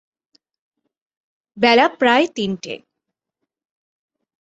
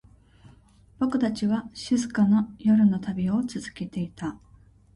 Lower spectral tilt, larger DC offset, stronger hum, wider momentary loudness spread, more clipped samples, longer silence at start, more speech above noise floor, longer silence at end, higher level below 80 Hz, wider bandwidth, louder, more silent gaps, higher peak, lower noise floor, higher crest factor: second, -4.5 dB/octave vs -6.5 dB/octave; neither; neither; first, 17 LU vs 13 LU; neither; first, 1.55 s vs 1 s; first, 65 dB vs 31 dB; first, 1.65 s vs 0.6 s; second, -64 dBFS vs -56 dBFS; second, 8 kHz vs 11 kHz; first, -16 LUFS vs -25 LUFS; neither; first, -2 dBFS vs -12 dBFS; first, -81 dBFS vs -55 dBFS; first, 20 dB vs 14 dB